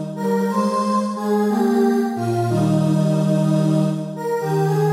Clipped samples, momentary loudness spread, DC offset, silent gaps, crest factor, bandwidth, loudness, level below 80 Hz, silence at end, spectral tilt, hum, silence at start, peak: under 0.1%; 4 LU; under 0.1%; none; 10 dB; 15.5 kHz; -19 LUFS; -62 dBFS; 0 s; -7.5 dB/octave; none; 0 s; -8 dBFS